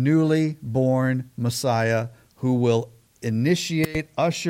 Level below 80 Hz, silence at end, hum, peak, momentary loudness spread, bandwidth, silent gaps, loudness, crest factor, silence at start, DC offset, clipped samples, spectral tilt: -54 dBFS; 0 s; none; -8 dBFS; 7 LU; 16.5 kHz; none; -23 LUFS; 14 dB; 0 s; under 0.1%; under 0.1%; -6 dB/octave